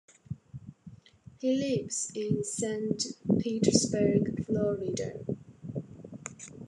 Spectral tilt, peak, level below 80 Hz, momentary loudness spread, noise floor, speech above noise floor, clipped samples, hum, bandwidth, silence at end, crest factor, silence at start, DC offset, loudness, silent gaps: -5 dB/octave; -8 dBFS; -64 dBFS; 18 LU; -54 dBFS; 25 dB; under 0.1%; none; 12 kHz; 0 s; 24 dB; 0.3 s; under 0.1%; -30 LUFS; none